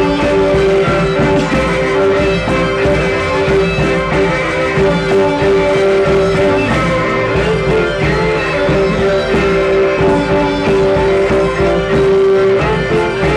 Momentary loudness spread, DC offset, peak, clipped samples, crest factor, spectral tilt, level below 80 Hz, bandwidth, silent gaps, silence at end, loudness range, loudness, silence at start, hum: 2 LU; under 0.1%; -2 dBFS; under 0.1%; 10 dB; -6.5 dB/octave; -28 dBFS; 10.5 kHz; none; 0 s; 1 LU; -12 LUFS; 0 s; none